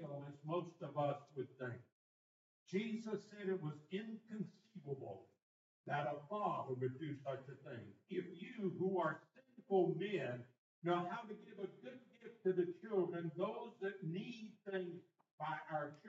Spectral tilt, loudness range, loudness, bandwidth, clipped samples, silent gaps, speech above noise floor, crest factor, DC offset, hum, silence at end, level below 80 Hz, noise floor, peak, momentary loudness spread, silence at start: -6 dB/octave; 5 LU; -44 LUFS; 7.6 kHz; under 0.1%; 1.92-2.66 s, 5.42-5.84 s, 10.58-10.82 s, 15.31-15.38 s; over 48 dB; 20 dB; under 0.1%; none; 0 s; under -90 dBFS; under -90 dBFS; -24 dBFS; 14 LU; 0 s